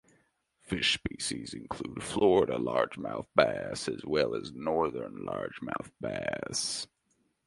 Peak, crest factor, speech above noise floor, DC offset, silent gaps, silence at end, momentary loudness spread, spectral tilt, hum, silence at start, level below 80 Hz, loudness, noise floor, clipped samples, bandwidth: -6 dBFS; 26 dB; 43 dB; under 0.1%; none; 0.6 s; 11 LU; -3.5 dB/octave; none; 0.65 s; -58 dBFS; -31 LUFS; -75 dBFS; under 0.1%; 11.5 kHz